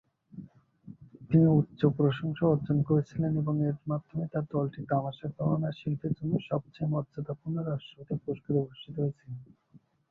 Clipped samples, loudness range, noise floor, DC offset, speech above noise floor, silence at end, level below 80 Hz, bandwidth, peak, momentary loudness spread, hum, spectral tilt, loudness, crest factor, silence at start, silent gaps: under 0.1%; 7 LU; -61 dBFS; under 0.1%; 32 dB; 0.65 s; -62 dBFS; 4.3 kHz; -10 dBFS; 13 LU; none; -10.5 dB/octave; -30 LUFS; 20 dB; 0.35 s; none